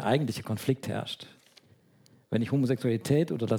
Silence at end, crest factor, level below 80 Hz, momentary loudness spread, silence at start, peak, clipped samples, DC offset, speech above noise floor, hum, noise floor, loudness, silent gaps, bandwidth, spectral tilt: 0 s; 18 dB; -66 dBFS; 10 LU; 0 s; -12 dBFS; under 0.1%; under 0.1%; 33 dB; none; -61 dBFS; -29 LUFS; none; 18 kHz; -6.5 dB/octave